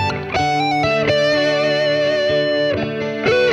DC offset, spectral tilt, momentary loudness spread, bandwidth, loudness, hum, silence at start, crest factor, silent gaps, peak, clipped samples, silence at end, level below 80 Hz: under 0.1%; -5 dB/octave; 4 LU; 9.6 kHz; -17 LUFS; none; 0 s; 12 dB; none; -4 dBFS; under 0.1%; 0 s; -46 dBFS